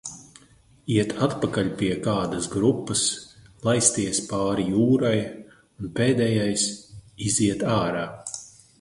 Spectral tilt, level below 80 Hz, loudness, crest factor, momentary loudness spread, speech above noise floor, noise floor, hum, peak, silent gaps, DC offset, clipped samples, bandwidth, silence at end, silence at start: -4.5 dB/octave; -52 dBFS; -23 LUFS; 20 dB; 15 LU; 32 dB; -55 dBFS; none; -4 dBFS; none; under 0.1%; under 0.1%; 11.5 kHz; 0.3 s; 0.05 s